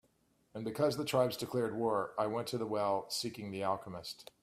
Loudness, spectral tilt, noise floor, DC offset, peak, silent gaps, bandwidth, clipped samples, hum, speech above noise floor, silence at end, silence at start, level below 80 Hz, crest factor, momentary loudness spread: -36 LUFS; -5 dB/octave; -73 dBFS; under 0.1%; -16 dBFS; none; 16 kHz; under 0.1%; none; 38 dB; 0.2 s; 0.55 s; -74 dBFS; 20 dB; 11 LU